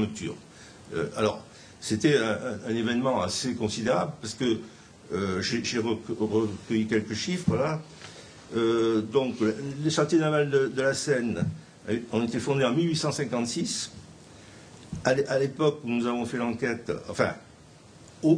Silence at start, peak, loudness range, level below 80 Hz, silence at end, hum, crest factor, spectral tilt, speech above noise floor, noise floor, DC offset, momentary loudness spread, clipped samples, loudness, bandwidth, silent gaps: 0 s; -6 dBFS; 3 LU; -60 dBFS; 0 s; none; 22 dB; -5 dB/octave; 25 dB; -52 dBFS; under 0.1%; 14 LU; under 0.1%; -28 LUFS; 10.5 kHz; none